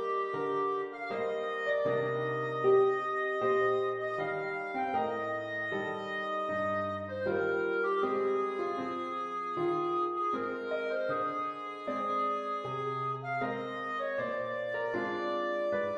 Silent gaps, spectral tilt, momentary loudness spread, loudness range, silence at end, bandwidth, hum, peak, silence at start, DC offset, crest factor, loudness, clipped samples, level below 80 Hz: none; -6.5 dB/octave; 6 LU; 4 LU; 0 s; 7.8 kHz; none; -16 dBFS; 0 s; under 0.1%; 16 dB; -33 LUFS; under 0.1%; -74 dBFS